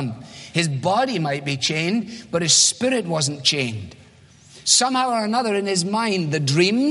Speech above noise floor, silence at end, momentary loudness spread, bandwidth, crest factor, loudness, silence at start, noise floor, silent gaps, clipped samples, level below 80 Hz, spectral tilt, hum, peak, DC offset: 29 dB; 0 s; 11 LU; 11.5 kHz; 20 dB; -19 LUFS; 0 s; -49 dBFS; none; under 0.1%; -62 dBFS; -3 dB/octave; none; -2 dBFS; under 0.1%